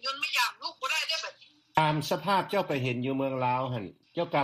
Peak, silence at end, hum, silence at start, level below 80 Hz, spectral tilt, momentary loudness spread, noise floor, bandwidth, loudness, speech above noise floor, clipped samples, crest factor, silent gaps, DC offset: -8 dBFS; 0 s; none; 0.05 s; -68 dBFS; -4.5 dB/octave; 8 LU; -50 dBFS; 15 kHz; -29 LUFS; 21 dB; under 0.1%; 22 dB; none; under 0.1%